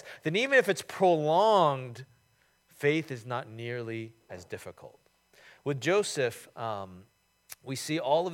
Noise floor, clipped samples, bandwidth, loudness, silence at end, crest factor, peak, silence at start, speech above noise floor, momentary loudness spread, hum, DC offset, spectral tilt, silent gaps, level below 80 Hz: -69 dBFS; under 0.1%; 16.5 kHz; -29 LUFS; 0 s; 20 dB; -10 dBFS; 0.05 s; 40 dB; 20 LU; none; under 0.1%; -4.5 dB/octave; none; -78 dBFS